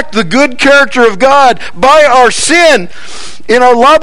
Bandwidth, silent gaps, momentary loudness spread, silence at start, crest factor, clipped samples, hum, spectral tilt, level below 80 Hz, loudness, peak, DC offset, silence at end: 15.5 kHz; none; 12 LU; 0 s; 8 dB; 5%; none; -2.5 dB/octave; -38 dBFS; -6 LUFS; 0 dBFS; 10%; 0 s